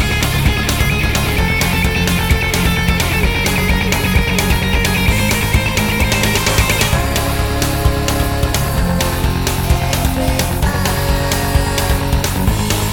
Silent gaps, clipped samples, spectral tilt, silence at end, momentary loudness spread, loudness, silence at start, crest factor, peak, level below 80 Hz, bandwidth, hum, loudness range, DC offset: none; under 0.1%; -4 dB/octave; 0 s; 3 LU; -15 LUFS; 0 s; 14 dB; 0 dBFS; -20 dBFS; 17.5 kHz; none; 2 LU; under 0.1%